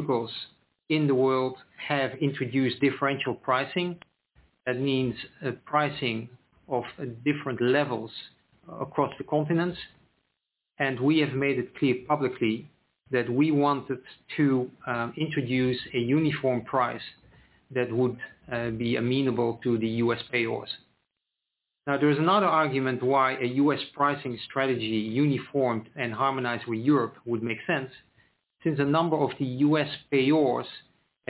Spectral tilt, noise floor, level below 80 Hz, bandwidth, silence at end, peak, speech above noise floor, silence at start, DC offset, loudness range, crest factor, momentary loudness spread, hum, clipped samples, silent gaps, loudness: -5 dB/octave; -84 dBFS; -64 dBFS; 4 kHz; 0.5 s; -10 dBFS; 58 dB; 0 s; under 0.1%; 4 LU; 18 dB; 11 LU; none; under 0.1%; none; -27 LUFS